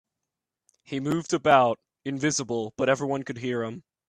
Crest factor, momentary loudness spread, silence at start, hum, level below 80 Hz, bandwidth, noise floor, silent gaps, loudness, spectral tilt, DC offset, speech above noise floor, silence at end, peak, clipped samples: 22 dB; 14 LU; 0.9 s; none; -66 dBFS; 14 kHz; -86 dBFS; none; -26 LUFS; -4.5 dB/octave; under 0.1%; 61 dB; 0.3 s; -4 dBFS; under 0.1%